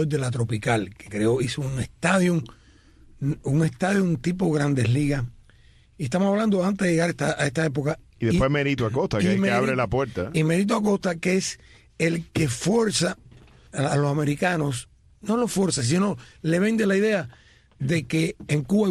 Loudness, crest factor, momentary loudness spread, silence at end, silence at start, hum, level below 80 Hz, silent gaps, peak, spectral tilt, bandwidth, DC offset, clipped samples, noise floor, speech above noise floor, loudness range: -24 LUFS; 16 dB; 8 LU; 0 s; 0 s; none; -48 dBFS; none; -8 dBFS; -5.5 dB/octave; 14 kHz; under 0.1%; under 0.1%; -54 dBFS; 31 dB; 2 LU